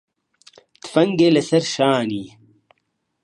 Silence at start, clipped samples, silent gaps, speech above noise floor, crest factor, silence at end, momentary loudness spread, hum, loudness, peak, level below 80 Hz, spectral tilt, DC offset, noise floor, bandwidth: 0.85 s; under 0.1%; none; 55 dB; 20 dB; 0.95 s; 18 LU; none; -18 LUFS; -2 dBFS; -66 dBFS; -5.5 dB/octave; under 0.1%; -72 dBFS; 11 kHz